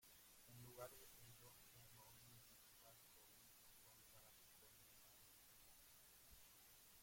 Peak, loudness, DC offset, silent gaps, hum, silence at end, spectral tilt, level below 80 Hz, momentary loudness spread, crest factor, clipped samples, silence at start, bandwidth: -40 dBFS; -65 LUFS; under 0.1%; none; none; 0 s; -2.5 dB/octave; -82 dBFS; 6 LU; 26 dB; under 0.1%; 0 s; 16.5 kHz